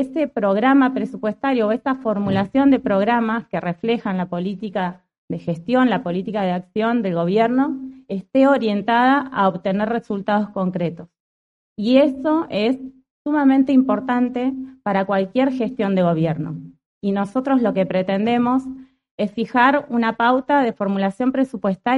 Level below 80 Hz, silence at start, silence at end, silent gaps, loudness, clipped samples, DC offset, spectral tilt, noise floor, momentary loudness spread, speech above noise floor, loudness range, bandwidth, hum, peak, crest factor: -58 dBFS; 0 s; 0 s; 5.18-5.28 s, 11.20-11.76 s, 13.10-13.25 s, 16.86-17.01 s, 19.11-19.18 s; -19 LUFS; under 0.1%; under 0.1%; -8 dB/octave; under -90 dBFS; 10 LU; over 71 dB; 3 LU; 7.2 kHz; none; -2 dBFS; 18 dB